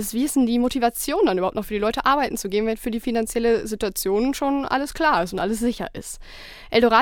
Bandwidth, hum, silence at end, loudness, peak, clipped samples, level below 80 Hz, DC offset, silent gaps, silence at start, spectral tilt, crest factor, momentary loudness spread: 18 kHz; none; 0 s; -22 LUFS; -2 dBFS; under 0.1%; -42 dBFS; under 0.1%; none; 0 s; -4 dB/octave; 20 dB; 8 LU